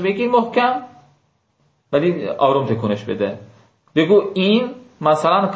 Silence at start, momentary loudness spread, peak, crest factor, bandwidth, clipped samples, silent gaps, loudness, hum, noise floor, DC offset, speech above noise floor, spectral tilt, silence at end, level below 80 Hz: 0 s; 9 LU; -2 dBFS; 16 dB; 8 kHz; under 0.1%; none; -18 LUFS; none; -63 dBFS; under 0.1%; 46 dB; -7 dB/octave; 0 s; -58 dBFS